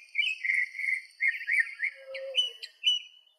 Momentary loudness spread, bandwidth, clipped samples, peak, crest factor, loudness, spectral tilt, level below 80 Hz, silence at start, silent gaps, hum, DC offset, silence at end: 6 LU; 15.5 kHz; under 0.1%; -14 dBFS; 18 dB; -28 LUFS; 7 dB/octave; under -90 dBFS; 0 s; none; none; under 0.1%; 0.3 s